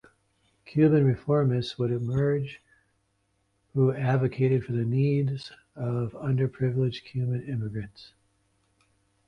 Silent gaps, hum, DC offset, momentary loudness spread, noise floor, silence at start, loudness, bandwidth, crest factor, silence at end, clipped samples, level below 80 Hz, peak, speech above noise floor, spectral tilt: none; none; under 0.1%; 11 LU; -72 dBFS; 0.65 s; -27 LUFS; 6.6 kHz; 18 dB; 1.2 s; under 0.1%; -58 dBFS; -10 dBFS; 47 dB; -9 dB/octave